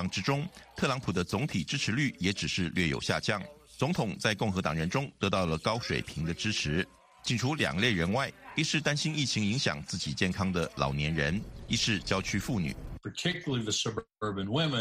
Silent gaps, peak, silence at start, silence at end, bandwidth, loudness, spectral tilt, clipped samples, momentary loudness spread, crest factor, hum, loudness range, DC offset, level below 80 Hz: none; -10 dBFS; 0 s; 0 s; 15 kHz; -31 LUFS; -4.5 dB/octave; under 0.1%; 6 LU; 20 dB; none; 2 LU; under 0.1%; -50 dBFS